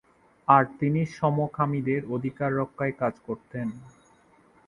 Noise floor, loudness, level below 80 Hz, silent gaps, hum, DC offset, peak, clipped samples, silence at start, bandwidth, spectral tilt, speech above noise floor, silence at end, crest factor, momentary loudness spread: -59 dBFS; -26 LUFS; -62 dBFS; none; none; under 0.1%; -4 dBFS; under 0.1%; 0.5 s; 10.5 kHz; -9 dB/octave; 33 dB; 0.8 s; 24 dB; 14 LU